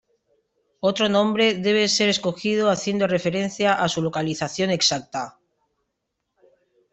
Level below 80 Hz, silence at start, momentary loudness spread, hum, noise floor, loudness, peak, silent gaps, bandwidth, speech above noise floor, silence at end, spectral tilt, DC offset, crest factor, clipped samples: -62 dBFS; 0.85 s; 7 LU; none; -78 dBFS; -21 LUFS; -6 dBFS; none; 8.4 kHz; 57 dB; 1.65 s; -4 dB/octave; under 0.1%; 18 dB; under 0.1%